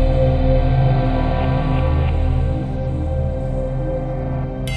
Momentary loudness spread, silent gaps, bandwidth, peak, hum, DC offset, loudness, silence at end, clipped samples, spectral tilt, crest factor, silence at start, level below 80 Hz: 7 LU; none; 10 kHz; -4 dBFS; none; under 0.1%; -20 LUFS; 0 s; under 0.1%; -9 dB/octave; 12 dB; 0 s; -22 dBFS